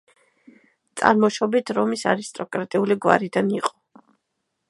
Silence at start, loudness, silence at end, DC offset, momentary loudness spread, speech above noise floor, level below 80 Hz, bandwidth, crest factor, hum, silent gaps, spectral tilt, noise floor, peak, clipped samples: 0.95 s; -22 LUFS; 1 s; under 0.1%; 11 LU; 56 dB; -66 dBFS; 11.5 kHz; 22 dB; none; none; -5 dB/octave; -77 dBFS; 0 dBFS; under 0.1%